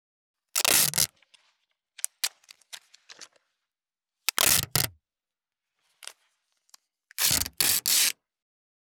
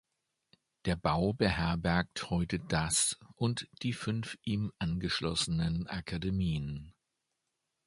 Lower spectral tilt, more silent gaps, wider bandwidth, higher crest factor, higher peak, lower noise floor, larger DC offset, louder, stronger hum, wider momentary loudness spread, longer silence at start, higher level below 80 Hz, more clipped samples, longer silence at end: second, 0 dB/octave vs -4.5 dB/octave; neither; first, over 20 kHz vs 11.5 kHz; first, 30 dB vs 22 dB; first, -2 dBFS vs -12 dBFS; first, under -90 dBFS vs -85 dBFS; neither; first, -24 LUFS vs -33 LUFS; neither; first, 25 LU vs 7 LU; second, 0.55 s vs 0.85 s; second, -58 dBFS vs -48 dBFS; neither; about the same, 0.85 s vs 0.95 s